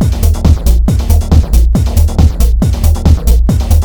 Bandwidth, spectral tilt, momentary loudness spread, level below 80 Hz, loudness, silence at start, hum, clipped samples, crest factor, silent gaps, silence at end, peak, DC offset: over 20 kHz; -7 dB/octave; 2 LU; -10 dBFS; -11 LUFS; 0 s; none; 2%; 8 dB; none; 0 s; 0 dBFS; 2%